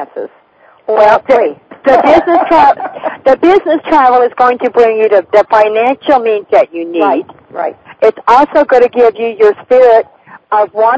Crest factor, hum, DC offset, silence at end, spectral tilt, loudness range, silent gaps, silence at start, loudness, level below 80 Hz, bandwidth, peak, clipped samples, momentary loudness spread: 10 dB; none; under 0.1%; 0 s; -5.5 dB/octave; 2 LU; none; 0 s; -9 LUFS; -48 dBFS; 8 kHz; 0 dBFS; 3%; 12 LU